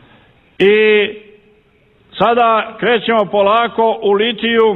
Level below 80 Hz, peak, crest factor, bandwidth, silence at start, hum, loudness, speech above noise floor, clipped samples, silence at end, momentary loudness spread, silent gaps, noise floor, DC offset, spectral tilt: -54 dBFS; -2 dBFS; 12 dB; 4.2 kHz; 0.6 s; none; -13 LUFS; 40 dB; under 0.1%; 0 s; 5 LU; none; -52 dBFS; under 0.1%; -7 dB/octave